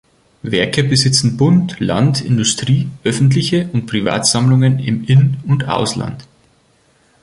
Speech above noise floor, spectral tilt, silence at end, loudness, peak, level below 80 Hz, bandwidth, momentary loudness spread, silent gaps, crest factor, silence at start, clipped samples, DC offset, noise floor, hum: 41 dB; -5 dB/octave; 1 s; -14 LUFS; 0 dBFS; -46 dBFS; 11.5 kHz; 7 LU; none; 14 dB; 0.45 s; under 0.1%; under 0.1%; -55 dBFS; none